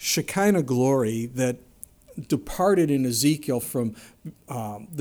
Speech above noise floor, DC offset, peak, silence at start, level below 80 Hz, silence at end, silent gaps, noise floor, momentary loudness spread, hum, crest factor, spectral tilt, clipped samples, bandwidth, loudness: 24 dB; under 0.1%; -8 dBFS; 0 s; -52 dBFS; 0 s; none; -48 dBFS; 18 LU; none; 16 dB; -5 dB/octave; under 0.1%; over 20 kHz; -24 LUFS